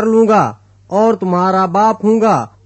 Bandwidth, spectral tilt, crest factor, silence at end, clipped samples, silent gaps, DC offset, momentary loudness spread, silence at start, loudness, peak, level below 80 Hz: 8.4 kHz; -7 dB/octave; 12 dB; 0.2 s; under 0.1%; none; under 0.1%; 4 LU; 0 s; -13 LUFS; -2 dBFS; -56 dBFS